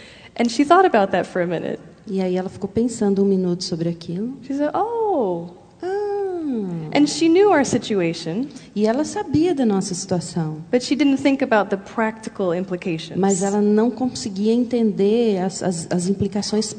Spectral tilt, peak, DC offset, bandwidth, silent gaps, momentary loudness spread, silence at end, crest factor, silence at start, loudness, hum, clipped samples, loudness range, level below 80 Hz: -5.5 dB/octave; 0 dBFS; under 0.1%; 9.4 kHz; none; 10 LU; 0 s; 20 dB; 0 s; -20 LUFS; none; under 0.1%; 3 LU; -56 dBFS